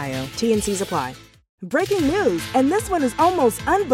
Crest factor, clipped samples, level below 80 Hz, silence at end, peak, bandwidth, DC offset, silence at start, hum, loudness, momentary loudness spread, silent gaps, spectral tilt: 16 dB; under 0.1%; -44 dBFS; 0 s; -4 dBFS; 16.5 kHz; under 0.1%; 0 s; none; -20 LUFS; 8 LU; 1.49-1.58 s; -4.5 dB/octave